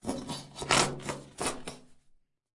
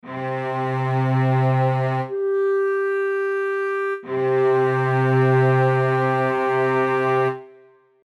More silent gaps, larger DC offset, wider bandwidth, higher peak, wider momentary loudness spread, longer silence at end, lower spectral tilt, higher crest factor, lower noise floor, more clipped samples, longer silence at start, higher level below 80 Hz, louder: neither; neither; first, 11.5 kHz vs 6.4 kHz; about the same, -8 dBFS vs -8 dBFS; first, 15 LU vs 7 LU; about the same, 0.6 s vs 0.6 s; second, -2.5 dB/octave vs -8.5 dB/octave; first, 28 dB vs 12 dB; first, -64 dBFS vs -52 dBFS; neither; about the same, 0.05 s vs 0.05 s; first, -56 dBFS vs -74 dBFS; second, -31 LUFS vs -20 LUFS